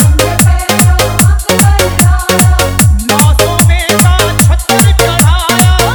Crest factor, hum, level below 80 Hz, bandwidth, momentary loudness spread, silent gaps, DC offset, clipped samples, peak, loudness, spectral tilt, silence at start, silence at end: 8 dB; none; -14 dBFS; over 20 kHz; 1 LU; none; 0.4%; 1%; 0 dBFS; -8 LUFS; -4 dB/octave; 0 s; 0 s